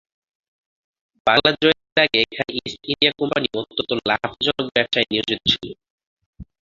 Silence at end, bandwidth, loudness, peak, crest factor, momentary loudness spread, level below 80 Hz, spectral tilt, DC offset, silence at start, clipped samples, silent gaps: 0.25 s; 7.6 kHz; -19 LUFS; 0 dBFS; 22 dB; 9 LU; -52 dBFS; -4.5 dB/octave; under 0.1%; 1.25 s; under 0.1%; 1.92-1.96 s, 5.90-5.98 s, 6.07-6.17 s, 6.26-6.33 s